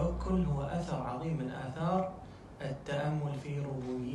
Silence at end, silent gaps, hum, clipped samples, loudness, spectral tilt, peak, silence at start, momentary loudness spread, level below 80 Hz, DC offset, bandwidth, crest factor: 0 s; none; none; under 0.1%; -36 LUFS; -8 dB/octave; -18 dBFS; 0 s; 9 LU; -46 dBFS; under 0.1%; 10.5 kHz; 16 dB